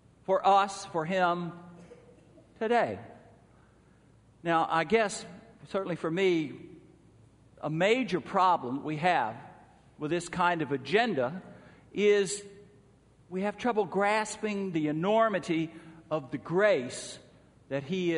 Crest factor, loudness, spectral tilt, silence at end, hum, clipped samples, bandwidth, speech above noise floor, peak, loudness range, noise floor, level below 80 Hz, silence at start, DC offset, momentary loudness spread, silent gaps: 20 dB; -29 LUFS; -5 dB/octave; 0 s; none; under 0.1%; 10.5 kHz; 32 dB; -12 dBFS; 3 LU; -60 dBFS; -68 dBFS; 0.3 s; under 0.1%; 14 LU; none